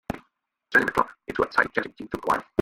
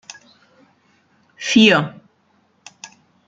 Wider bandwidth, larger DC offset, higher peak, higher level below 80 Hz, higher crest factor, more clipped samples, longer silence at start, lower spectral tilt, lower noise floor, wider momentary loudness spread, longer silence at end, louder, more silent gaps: first, 16.5 kHz vs 7.8 kHz; neither; second, -6 dBFS vs -2 dBFS; first, -54 dBFS vs -62 dBFS; about the same, 22 dB vs 20 dB; neither; second, 0.1 s vs 1.4 s; first, -5.5 dB/octave vs -4 dB/octave; first, -69 dBFS vs -61 dBFS; second, 13 LU vs 28 LU; second, 0 s vs 1.4 s; second, -25 LUFS vs -15 LUFS; neither